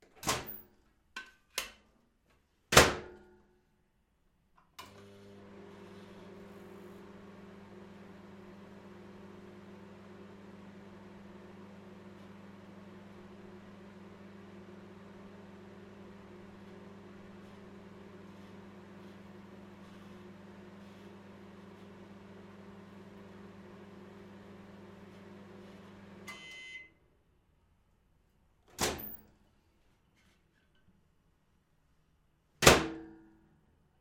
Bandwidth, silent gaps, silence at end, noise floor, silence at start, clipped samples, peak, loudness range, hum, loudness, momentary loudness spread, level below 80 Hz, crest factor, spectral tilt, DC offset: 16 kHz; none; 0.65 s; -73 dBFS; 0 s; under 0.1%; -4 dBFS; 21 LU; none; -29 LUFS; 18 LU; -58 dBFS; 36 dB; -3 dB/octave; under 0.1%